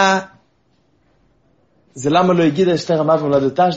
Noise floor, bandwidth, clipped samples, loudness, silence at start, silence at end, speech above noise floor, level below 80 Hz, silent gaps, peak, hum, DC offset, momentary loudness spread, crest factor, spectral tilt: -60 dBFS; 8 kHz; under 0.1%; -16 LUFS; 0 s; 0 s; 45 dB; -58 dBFS; none; -2 dBFS; none; under 0.1%; 4 LU; 16 dB; -4.5 dB/octave